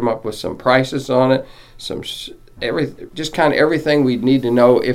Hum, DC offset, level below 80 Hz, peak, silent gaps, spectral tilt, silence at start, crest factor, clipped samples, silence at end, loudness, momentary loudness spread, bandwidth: none; under 0.1%; -46 dBFS; 0 dBFS; none; -6 dB/octave; 0 s; 16 dB; under 0.1%; 0 s; -17 LUFS; 14 LU; 15.5 kHz